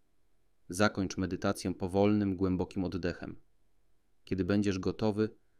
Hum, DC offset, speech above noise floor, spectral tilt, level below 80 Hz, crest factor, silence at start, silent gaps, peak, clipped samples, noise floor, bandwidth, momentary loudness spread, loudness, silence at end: none; under 0.1%; 43 dB; -6.5 dB/octave; -58 dBFS; 20 dB; 0.7 s; none; -14 dBFS; under 0.1%; -75 dBFS; 14.5 kHz; 9 LU; -32 LUFS; 0.25 s